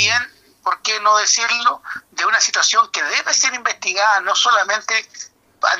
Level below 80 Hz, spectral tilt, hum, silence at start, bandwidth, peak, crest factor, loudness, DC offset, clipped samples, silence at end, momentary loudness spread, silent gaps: -70 dBFS; 1.5 dB/octave; none; 0 s; 14.5 kHz; 0 dBFS; 18 dB; -16 LUFS; under 0.1%; under 0.1%; 0 s; 14 LU; none